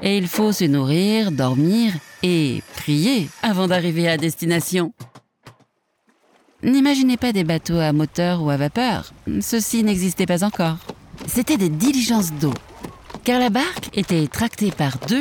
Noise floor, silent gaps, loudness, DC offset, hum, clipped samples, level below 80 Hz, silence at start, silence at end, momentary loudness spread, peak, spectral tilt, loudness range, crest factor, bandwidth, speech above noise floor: -64 dBFS; none; -20 LUFS; under 0.1%; none; under 0.1%; -48 dBFS; 0 s; 0 s; 7 LU; -2 dBFS; -5 dB/octave; 2 LU; 18 dB; over 20 kHz; 45 dB